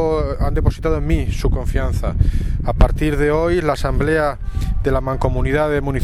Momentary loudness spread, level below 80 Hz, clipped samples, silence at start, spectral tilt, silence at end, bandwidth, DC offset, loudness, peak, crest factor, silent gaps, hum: 5 LU; -20 dBFS; under 0.1%; 0 s; -7.5 dB/octave; 0 s; 13 kHz; under 0.1%; -19 LUFS; 0 dBFS; 16 dB; none; none